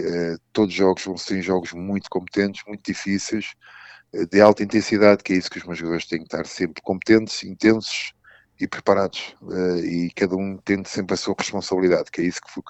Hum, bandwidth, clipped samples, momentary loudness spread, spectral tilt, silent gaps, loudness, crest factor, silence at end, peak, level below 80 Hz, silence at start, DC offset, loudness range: none; 8.4 kHz; under 0.1%; 13 LU; -5 dB/octave; none; -22 LUFS; 22 dB; 0 s; 0 dBFS; -58 dBFS; 0 s; under 0.1%; 4 LU